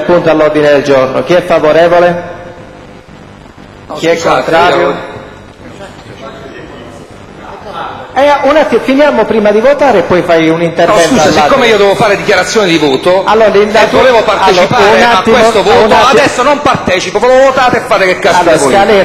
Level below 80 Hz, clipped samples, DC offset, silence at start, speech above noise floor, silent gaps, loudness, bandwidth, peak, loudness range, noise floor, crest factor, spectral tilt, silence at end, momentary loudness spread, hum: -36 dBFS; 2%; under 0.1%; 0 s; 25 dB; none; -7 LUFS; 16 kHz; 0 dBFS; 7 LU; -31 dBFS; 8 dB; -4.5 dB/octave; 0 s; 19 LU; none